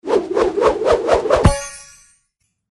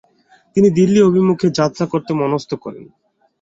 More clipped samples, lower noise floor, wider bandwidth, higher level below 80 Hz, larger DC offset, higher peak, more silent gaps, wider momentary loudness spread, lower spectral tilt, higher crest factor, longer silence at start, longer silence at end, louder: neither; first, -69 dBFS vs -53 dBFS; first, 12 kHz vs 7.8 kHz; first, -30 dBFS vs -54 dBFS; neither; about the same, -2 dBFS vs -2 dBFS; neither; about the same, 12 LU vs 13 LU; second, -5.5 dB/octave vs -7 dB/octave; about the same, 16 dB vs 14 dB; second, 0.05 s vs 0.55 s; first, 0.9 s vs 0.55 s; about the same, -16 LUFS vs -15 LUFS